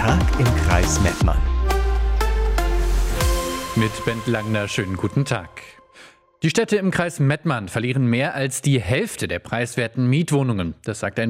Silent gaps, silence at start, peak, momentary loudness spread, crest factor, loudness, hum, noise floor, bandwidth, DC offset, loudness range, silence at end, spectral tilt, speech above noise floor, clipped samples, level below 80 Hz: none; 0 s; -2 dBFS; 6 LU; 18 dB; -21 LUFS; none; -48 dBFS; 16 kHz; under 0.1%; 3 LU; 0 s; -5.5 dB/octave; 28 dB; under 0.1%; -24 dBFS